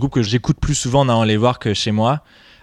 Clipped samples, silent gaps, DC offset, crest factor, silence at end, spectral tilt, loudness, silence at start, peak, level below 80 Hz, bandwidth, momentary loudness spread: under 0.1%; none; under 0.1%; 14 dB; 0.45 s; -5.5 dB/octave; -17 LUFS; 0 s; -4 dBFS; -34 dBFS; 11.5 kHz; 4 LU